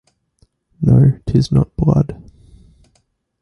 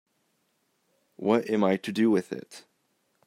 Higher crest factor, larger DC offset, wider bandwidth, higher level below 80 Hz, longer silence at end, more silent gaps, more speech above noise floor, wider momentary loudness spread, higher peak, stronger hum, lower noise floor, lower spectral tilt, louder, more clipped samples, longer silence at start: second, 14 dB vs 20 dB; neither; second, 6.8 kHz vs 15 kHz; first, -34 dBFS vs -74 dBFS; first, 1.3 s vs 0.65 s; neither; about the same, 50 dB vs 48 dB; second, 7 LU vs 12 LU; first, -2 dBFS vs -10 dBFS; neither; second, -63 dBFS vs -73 dBFS; first, -9 dB/octave vs -6.5 dB/octave; first, -15 LUFS vs -26 LUFS; neither; second, 0.8 s vs 1.2 s